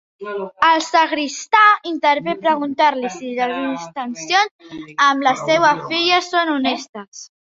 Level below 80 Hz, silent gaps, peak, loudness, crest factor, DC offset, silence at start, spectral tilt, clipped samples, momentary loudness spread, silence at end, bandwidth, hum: -66 dBFS; 4.51-4.59 s, 6.89-6.93 s, 7.08-7.12 s; 0 dBFS; -17 LUFS; 18 dB; under 0.1%; 0.2 s; -2.5 dB/octave; under 0.1%; 14 LU; 0.15 s; 7.8 kHz; none